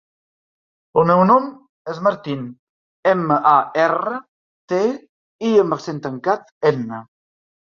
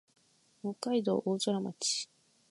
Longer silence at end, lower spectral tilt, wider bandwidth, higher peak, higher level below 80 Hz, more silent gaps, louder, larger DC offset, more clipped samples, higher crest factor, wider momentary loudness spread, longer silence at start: first, 0.7 s vs 0.45 s; first, -7 dB/octave vs -4 dB/octave; second, 7.4 kHz vs 11.5 kHz; first, -2 dBFS vs -16 dBFS; first, -64 dBFS vs -84 dBFS; first, 1.69-1.85 s, 2.59-3.03 s, 4.28-4.68 s, 5.09-5.39 s, 6.51-6.61 s vs none; first, -18 LUFS vs -33 LUFS; neither; neither; about the same, 18 dB vs 18 dB; first, 17 LU vs 11 LU; first, 0.95 s vs 0.65 s